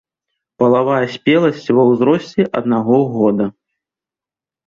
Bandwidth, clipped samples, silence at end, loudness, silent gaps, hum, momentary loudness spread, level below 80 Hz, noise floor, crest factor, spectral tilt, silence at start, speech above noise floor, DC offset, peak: 7.2 kHz; under 0.1%; 1.15 s; -15 LUFS; none; none; 5 LU; -58 dBFS; -89 dBFS; 14 dB; -8 dB/octave; 0.6 s; 75 dB; under 0.1%; -2 dBFS